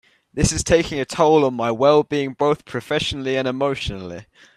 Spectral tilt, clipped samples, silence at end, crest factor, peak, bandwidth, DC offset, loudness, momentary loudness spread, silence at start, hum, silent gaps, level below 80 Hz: -4.5 dB/octave; under 0.1%; 0.35 s; 18 dB; -2 dBFS; 13.5 kHz; under 0.1%; -19 LUFS; 12 LU; 0.35 s; none; none; -40 dBFS